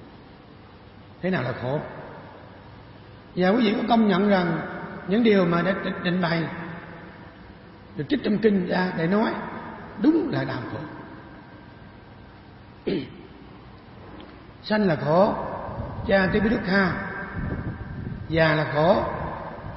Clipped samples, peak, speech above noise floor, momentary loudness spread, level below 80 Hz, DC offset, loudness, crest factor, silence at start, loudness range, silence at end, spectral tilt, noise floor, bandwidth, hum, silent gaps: under 0.1%; -6 dBFS; 25 dB; 24 LU; -48 dBFS; under 0.1%; -24 LUFS; 20 dB; 0 s; 11 LU; 0 s; -11 dB/octave; -47 dBFS; 5.8 kHz; none; none